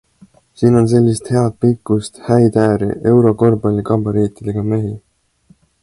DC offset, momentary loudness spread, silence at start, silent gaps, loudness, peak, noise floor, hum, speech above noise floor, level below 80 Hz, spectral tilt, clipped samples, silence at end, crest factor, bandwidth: under 0.1%; 8 LU; 0.6 s; none; -15 LUFS; 0 dBFS; -52 dBFS; none; 39 dB; -44 dBFS; -8 dB/octave; under 0.1%; 0.85 s; 14 dB; 11.5 kHz